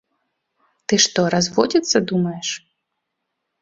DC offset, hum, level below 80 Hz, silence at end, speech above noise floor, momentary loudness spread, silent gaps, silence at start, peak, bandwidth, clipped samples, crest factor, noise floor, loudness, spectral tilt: under 0.1%; none; -58 dBFS; 1.05 s; 59 dB; 11 LU; none; 0.9 s; 0 dBFS; 7.8 kHz; under 0.1%; 22 dB; -77 dBFS; -18 LUFS; -3.5 dB/octave